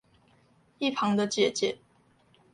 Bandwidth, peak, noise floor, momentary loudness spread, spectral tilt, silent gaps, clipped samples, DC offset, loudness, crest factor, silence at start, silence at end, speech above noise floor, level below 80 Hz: 11.5 kHz; -12 dBFS; -64 dBFS; 6 LU; -4 dB/octave; none; under 0.1%; under 0.1%; -28 LUFS; 20 dB; 0.8 s; 0.8 s; 37 dB; -72 dBFS